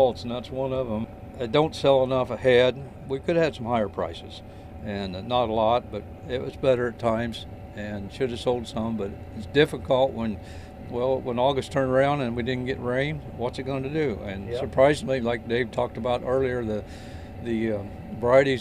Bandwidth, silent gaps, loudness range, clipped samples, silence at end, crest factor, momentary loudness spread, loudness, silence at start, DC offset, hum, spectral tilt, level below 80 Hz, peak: 12 kHz; none; 4 LU; under 0.1%; 0 s; 20 dB; 16 LU; -25 LUFS; 0 s; under 0.1%; none; -6.5 dB/octave; -46 dBFS; -4 dBFS